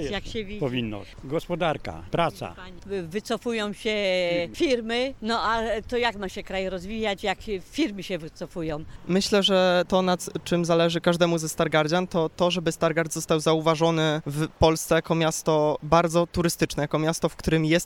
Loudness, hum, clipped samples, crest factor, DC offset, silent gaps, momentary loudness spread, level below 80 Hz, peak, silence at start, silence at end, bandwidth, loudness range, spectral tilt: -25 LUFS; none; under 0.1%; 20 dB; under 0.1%; none; 11 LU; -46 dBFS; -4 dBFS; 0 s; 0 s; 17.5 kHz; 6 LU; -5 dB/octave